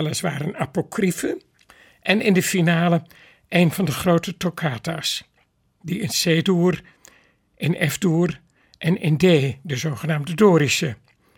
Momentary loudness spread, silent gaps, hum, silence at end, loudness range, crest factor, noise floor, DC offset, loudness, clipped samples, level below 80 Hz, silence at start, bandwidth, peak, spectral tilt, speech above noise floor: 11 LU; none; none; 0.4 s; 3 LU; 18 dB; -64 dBFS; under 0.1%; -21 LUFS; under 0.1%; -56 dBFS; 0 s; 18 kHz; -4 dBFS; -5 dB/octave; 44 dB